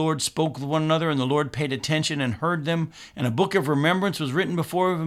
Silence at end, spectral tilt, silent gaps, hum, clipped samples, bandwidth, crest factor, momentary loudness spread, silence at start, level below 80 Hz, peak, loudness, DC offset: 0 s; -5 dB/octave; none; none; under 0.1%; 15.5 kHz; 16 dB; 5 LU; 0 s; -60 dBFS; -8 dBFS; -24 LUFS; under 0.1%